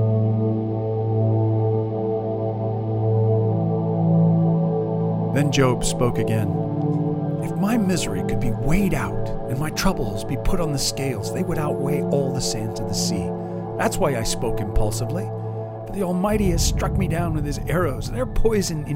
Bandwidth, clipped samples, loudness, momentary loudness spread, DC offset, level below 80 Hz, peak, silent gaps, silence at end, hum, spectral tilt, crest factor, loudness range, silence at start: 16 kHz; under 0.1%; -22 LUFS; 7 LU; under 0.1%; -32 dBFS; -4 dBFS; none; 0 s; none; -6 dB/octave; 16 dB; 4 LU; 0 s